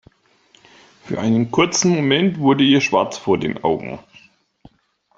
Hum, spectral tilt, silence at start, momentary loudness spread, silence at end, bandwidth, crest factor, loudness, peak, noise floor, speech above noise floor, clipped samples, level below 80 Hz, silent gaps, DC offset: none; -4.5 dB/octave; 1.05 s; 11 LU; 1.2 s; 8 kHz; 18 dB; -17 LUFS; -2 dBFS; -60 dBFS; 43 dB; under 0.1%; -56 dBFS; none; under 0.1%